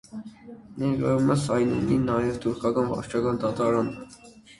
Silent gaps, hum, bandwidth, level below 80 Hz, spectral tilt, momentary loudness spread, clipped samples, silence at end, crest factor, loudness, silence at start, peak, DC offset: none; none; 11.5 kHz; -52 dBFS; -7 dB/octave; 18 LU; under 0.1%; 0.3 s; 18 dB; -25 LUFS; 0.1 s; -8 dBFS; under 0.1%